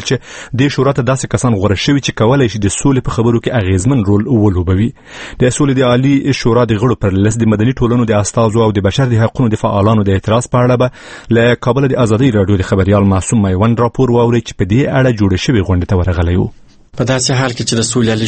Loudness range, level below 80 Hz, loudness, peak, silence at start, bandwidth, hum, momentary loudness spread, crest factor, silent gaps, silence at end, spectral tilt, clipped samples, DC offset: 1 LU; -32 dBFS; -12 LUFS; 0 dBFS; 0 s; 8.8 kHz; none; 4 LU; 12 dB; none; 0 s; -6 dB/octave; under 0.1%; under 0.1%